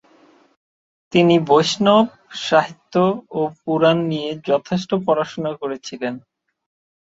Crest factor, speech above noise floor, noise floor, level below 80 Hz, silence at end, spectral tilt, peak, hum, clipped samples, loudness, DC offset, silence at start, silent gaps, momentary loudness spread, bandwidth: 18 dB; 35 dB; -53 dBFS; -62 dBFS; 0.85 s; -5.5 dB/octave; -2 dBFS; none; under 0.1%; -19 LUFS; under 0.1%; 1.1 s; none; 13 LU; 8 kHz